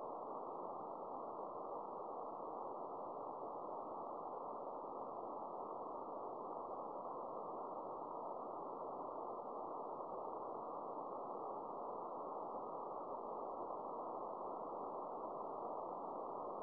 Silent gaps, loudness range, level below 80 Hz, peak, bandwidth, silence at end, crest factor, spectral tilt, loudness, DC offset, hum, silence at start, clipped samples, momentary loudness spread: none; 1 LU; -86 dBFS; -34 dBFS; 4.9 kHz; 0 s; 14 dB; -8.5 dB/octave; -48 LUFS; under 0.1%; none; 0 s; under 0.1%; 1 LU